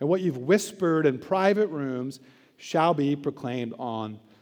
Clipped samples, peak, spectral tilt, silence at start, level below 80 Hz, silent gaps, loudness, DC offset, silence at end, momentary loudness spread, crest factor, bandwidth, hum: under 0.1%; -8 dBFS; -6 dB/octave; 0 s; -78 dBFS; none; -26 LUFS; under 0.1%; 0.25 s; 11 LU; 18 dB; over 20 kHz; none